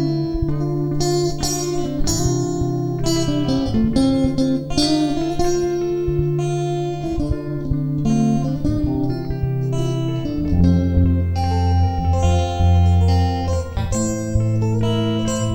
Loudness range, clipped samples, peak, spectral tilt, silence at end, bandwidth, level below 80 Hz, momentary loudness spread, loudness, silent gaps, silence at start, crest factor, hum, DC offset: 3 LU; under 0.1%; -4 dBFS; -6.5 dB/octave; 0 s; 16 kHz; -28 dBFS; 6 LU; -20 LUFS; none; 0 s; 14 dB; none; 0.6%